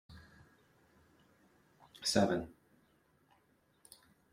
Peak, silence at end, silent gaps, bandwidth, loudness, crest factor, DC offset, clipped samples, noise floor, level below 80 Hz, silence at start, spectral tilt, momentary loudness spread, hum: -16 dBFS; 1.85 s; none; 16 kHz; -34 LUFS; 26 dB; under 0.1%; under 0.1%; -73 dBFS; -68 dBFS; 0.1 s; -4 dB/octave; 28 LU; none